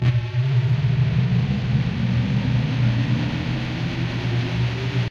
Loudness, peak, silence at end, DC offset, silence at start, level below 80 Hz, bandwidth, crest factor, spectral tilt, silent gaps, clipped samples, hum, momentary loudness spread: -22 LUFS; -8 dBFS; 0 s; under 0.1%; 0 s; -38 dBFS; 7 kHz; 12 dB; -7.5 dB/octave; none; under 0.1%; none; 5 LU